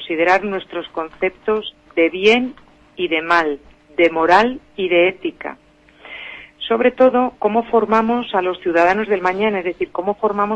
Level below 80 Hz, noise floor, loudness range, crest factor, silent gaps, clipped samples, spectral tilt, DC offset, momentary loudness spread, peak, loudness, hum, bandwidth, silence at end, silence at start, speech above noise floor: -52 dBFS; -41 dBFS; 2 LU; 16 dB; none; under 0.1%; -5.5 dB/octave; under 0.1%; 14 LU; -2 dBFS; -17 LUFS; none; 8.4 kHz; 0 s; 0 s; 24 dB